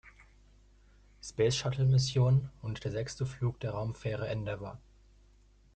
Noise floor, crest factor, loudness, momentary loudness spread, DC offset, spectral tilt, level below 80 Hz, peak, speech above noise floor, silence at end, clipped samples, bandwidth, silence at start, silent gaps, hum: -62 dBFS; 18 dB; -32 LUFS; 15 LU; under 0.1%; -6 dB/octave; -56 dBFS; -16 dBFS; 31 dB; 1 s; under 0.1%; 9 kHz; 0.05 s; none; 50 Hz at -55 dBFS